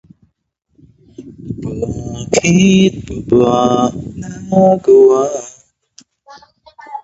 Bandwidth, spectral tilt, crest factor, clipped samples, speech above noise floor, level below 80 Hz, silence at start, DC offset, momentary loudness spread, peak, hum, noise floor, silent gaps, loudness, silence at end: 8 kHz; -6 dB/octave; 14 dB; under 0.1%; 53 dB; -42 dBFS; 1.2 s; under 0.1%; 19 LU; 0 dBFS; none; -65 dBFS; none; -12 LUFS; 0.05 s